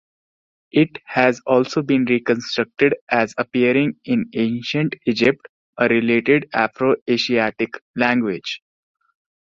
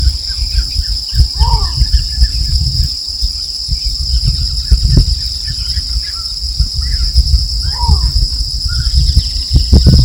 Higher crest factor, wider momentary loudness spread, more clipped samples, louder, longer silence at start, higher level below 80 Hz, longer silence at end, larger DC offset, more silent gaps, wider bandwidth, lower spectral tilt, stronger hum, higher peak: first, 18 dB vs 12 dB; about the same, 6 LU vs 5 LU; second, under 0.1% vs 1%; second, -19 LUFS vs -14 LUFS; first, 0.75 s vs 0 s; second, -60 dBFS vs -14 dBFS; first, 0.95 s vs 0 s; neither; first, 3.01-3.07 s, 5.49-5.73 s, 7.01-7.06 s, 7.81-7.94 s vs none; second, 7.6 kHz vs 17.5 kHz; first, -6 dB/octave vs -4.5 dB/octave; neither; about the same, -2 dBFS vs 0 dBFS